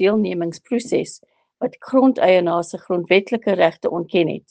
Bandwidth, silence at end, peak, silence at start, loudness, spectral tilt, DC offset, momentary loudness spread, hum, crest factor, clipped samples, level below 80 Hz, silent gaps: 9.4 kHz; 0.1 s; 0 dBFS; 0 s; -19 LUFS; -6 dB/octave; under 0.1%; 11 LU; none; 18 dB; under 0.1%; -66 dBFS; none